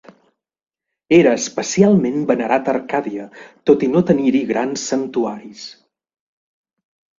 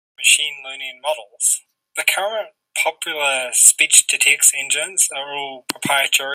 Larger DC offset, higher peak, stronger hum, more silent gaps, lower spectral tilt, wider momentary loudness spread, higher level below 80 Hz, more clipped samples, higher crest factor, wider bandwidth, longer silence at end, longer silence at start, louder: neither; about the same, 0 dBFS vs 0 dBFS; neither; neither; first, -5.5 dB/octave vs 1.5 dB/octave; about the same, 17 LU vs 16 LU; first, -58 dBFS vs -76 dBFS; neither; about the same, 18 dB vs 18 dB; second, 7.8 kHz vs 16.5 kHz; first, 1.5 s vs 0 s; first, 1.1 s vs 0.2 s; about the same, -17 LUFS vs -15 LUFS